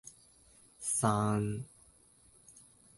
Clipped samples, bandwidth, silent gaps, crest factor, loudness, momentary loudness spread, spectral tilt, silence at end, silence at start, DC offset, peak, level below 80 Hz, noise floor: under 0.1%; 12 kHz; none; 22 dB; -33 LUFS; 25 LU; -5.5 dB/octave; 0.45 s; 0.05 s; under 0.1%; -14 dBFS; -64 dBFS; -64 dBFS